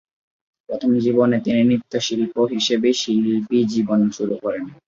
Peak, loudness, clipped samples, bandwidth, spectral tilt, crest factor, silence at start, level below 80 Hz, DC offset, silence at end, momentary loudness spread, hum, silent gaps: -4 dBFS; -19 LUFS; under 0.1%; 7.6 kHz; -5.5 dB/octave; 14 dB; 0.7 s; -62 dBFS; under 0.1%; 0.15 s; 7 LU; none; none